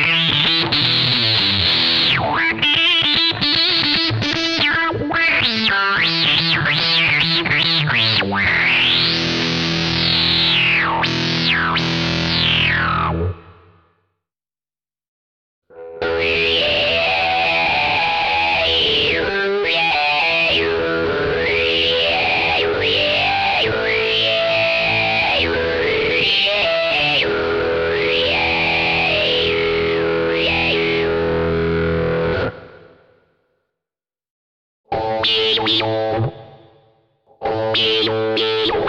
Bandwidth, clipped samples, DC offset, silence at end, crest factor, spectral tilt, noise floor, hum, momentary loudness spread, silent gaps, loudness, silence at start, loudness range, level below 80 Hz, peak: 10.5 kHz; under 0.1%; under 0.1%; 0 s; 12 dB; -4.5 dB/octave; under -90 dBFS; none; 5 LU; 15.08-15.62 s, 34.30-34.84 s; -15 LUFS; 0 s; 7 LU; -42 dBFS; -4 dBFS